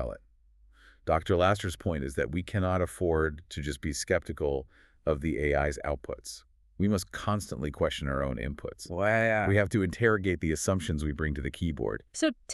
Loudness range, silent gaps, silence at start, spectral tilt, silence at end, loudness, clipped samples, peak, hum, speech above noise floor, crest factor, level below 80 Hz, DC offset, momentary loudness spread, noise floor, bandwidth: 4 LU; none; 0 s; -5.5 dB/octave; 0 s; -30 LUFS; under 0.1%; -10 dBFS; none; 31 dB; 20 dB; -42 dBFS; under 0.1%; 11 LU; -60 dBFS; 13.5 kHz